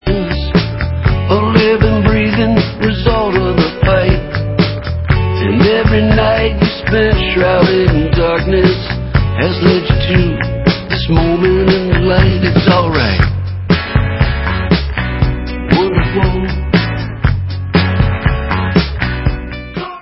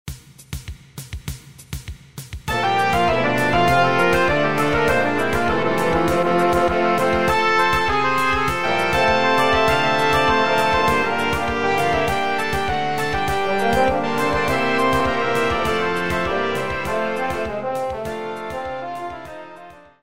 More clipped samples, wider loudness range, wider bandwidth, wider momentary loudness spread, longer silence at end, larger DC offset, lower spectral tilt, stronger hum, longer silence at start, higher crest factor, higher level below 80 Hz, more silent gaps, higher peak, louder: neither; second, 3 LU vs 6 LU; second, 5.8 kHz vs 16 kHz; second, 6 LU vs 17 LU; about the same, 0 s vs 0 s; second, under 0.1% vs 2%; first, -10 dB/octave vs -5 dB/octave; neither; about the same, 0.05 s vs 0.05 s; about the same, 12 dB vs 16 dB; first, -20 dBFS vs -38 dBFS; neither; first, 0 dBFS vs -4 dBFS; first, -13 LUFS vs -19 LUFS